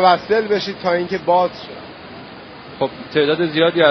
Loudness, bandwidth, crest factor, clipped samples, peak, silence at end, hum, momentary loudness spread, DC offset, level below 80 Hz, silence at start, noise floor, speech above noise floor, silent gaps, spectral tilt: -18 LUFS; 6.4 kHz; 18 dB; under 0.1%; 0 dBFS; 0 s; none; 20 LU; under 0.1%; -56 dBFS; 0 s; -36 dBFS; 20 dB; none; -2.5 dB/octave